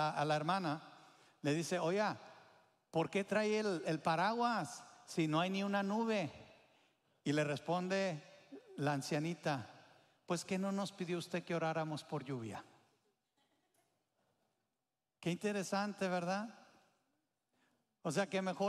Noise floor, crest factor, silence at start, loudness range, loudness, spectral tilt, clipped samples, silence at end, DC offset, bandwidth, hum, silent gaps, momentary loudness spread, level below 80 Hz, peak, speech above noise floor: under -90 dBFS; 20 dB; 0 s; 8 LU; -39 LUFS; -5.5 dB/octave; under 0.1%; 0 s; under 0.1%; 14 kHz; none; none; 11 LU; -86 dBFS; -20 dBFS; over 52 dB